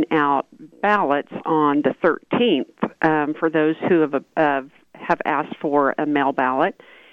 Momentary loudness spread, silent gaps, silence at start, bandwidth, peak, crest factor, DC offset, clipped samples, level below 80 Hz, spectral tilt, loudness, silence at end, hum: 5 LU; none; 0 s; 6.4 kHz; -4 dBFS; 16 dB; under 0.1%; under 0.1%; -66 dBFS; -7.5 dB/octave; -20 LUFS; 0.4 s; none